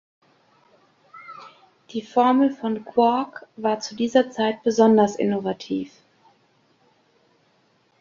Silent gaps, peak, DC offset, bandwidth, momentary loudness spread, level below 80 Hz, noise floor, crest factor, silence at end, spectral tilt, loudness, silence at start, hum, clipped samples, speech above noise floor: none; -4 dBFS; under 0.1%; 7.4 kHz; 19 LU; -68 dBFS; -63 dBFS; 20 dB; 2.15 s; -5.5 dB/octave; -22 LUFS; 1.15 s; none; under 0.1%; 42 dB